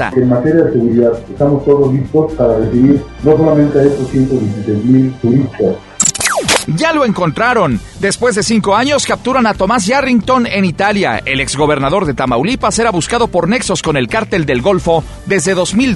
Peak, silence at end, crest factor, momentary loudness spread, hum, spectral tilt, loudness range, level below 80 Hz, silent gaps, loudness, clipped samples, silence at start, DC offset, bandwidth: 0 dBFS; 0 s; 12 dB; 4 LU; none; -5 dB/octave; 2 LU; -34 dBFS; none; -12 LUFS; under 0.1%; 0 s; under 0.1%; 12 kHz